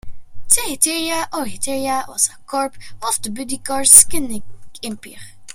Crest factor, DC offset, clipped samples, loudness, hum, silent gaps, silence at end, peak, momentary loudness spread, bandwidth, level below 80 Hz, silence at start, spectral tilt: 18 dB; under 0.1%; 0.3%; -15 LUFS; none; none; 0 s; 0 dBFS; 23 LU; 16.5 kHz; -44 dBFS; 0.05 s; -1 dB/octave